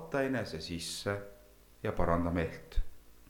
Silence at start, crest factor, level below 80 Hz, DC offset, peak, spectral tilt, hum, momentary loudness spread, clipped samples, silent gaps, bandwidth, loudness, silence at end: 0 s; 20 dB; -42 dBFS; under 0.1%; -16 dBFS; -5.5 dB/octave; none; 12 LU; under 0.1%; none; 19 kHz; -36 LUFS; 0.05 s